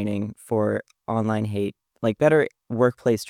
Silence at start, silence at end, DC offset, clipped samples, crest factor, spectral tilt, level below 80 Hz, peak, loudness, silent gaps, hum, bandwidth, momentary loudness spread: 0 s; 0 s; under 0.1%; under 0.1%; 20 dB; -7 dB/octave; -64 dBFS; -4 dBFS; -24 LUFS; none; none; 15 kHz; 10 LU